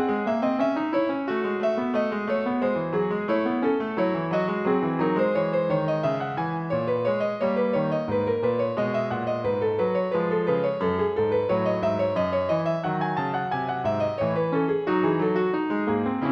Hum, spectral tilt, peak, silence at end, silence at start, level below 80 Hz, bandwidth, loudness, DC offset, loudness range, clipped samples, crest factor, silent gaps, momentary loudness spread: none; -8.5 dB/octave; -10 dBFS; 0 s; 0 s; -60 dBFS; 6.4 kHz; -25 LUFS; under 0.1%; 1 LU; under 0.1%; 14 dB; none; 3 LU